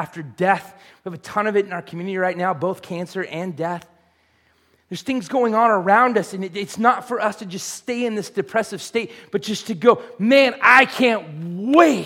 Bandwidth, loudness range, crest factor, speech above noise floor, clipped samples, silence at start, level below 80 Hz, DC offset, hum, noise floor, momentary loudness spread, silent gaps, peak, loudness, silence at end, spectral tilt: 16.5 kHz; 9 LU; 20 dB; 41 dB; under 0.1%; 0 s; -68 dBFS; under 0.1%; none; -61 dBFS; 14 LU; none; 0 dBFS; -19 LUFS; 0 s; -4.5 dB/octave